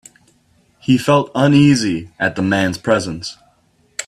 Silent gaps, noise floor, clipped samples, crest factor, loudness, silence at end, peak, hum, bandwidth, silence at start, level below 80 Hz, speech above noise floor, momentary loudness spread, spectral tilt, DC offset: none; -57 dBFS; under 0.1%; 16 dB; -16 LUFS; 0.05 s; 0 dBFS; none; 13.5 kHz; 0.9 s; -50 dBFS; 42 dB; 16 LU; -5.5 dB/octave; under 0.1%